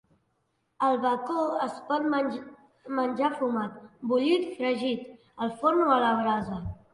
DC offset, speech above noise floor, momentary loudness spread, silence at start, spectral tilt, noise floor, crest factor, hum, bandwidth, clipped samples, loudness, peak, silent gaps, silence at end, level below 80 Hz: under 0.1%; 48 dB; 12 LU; 0.8 s; -6.5 dB/octave; -75 dBFS; 18 dB; none; 11 kHz; under 0.1%; -28 LUFS; -10 dBFS; none; 0.2 s; -56 dBFS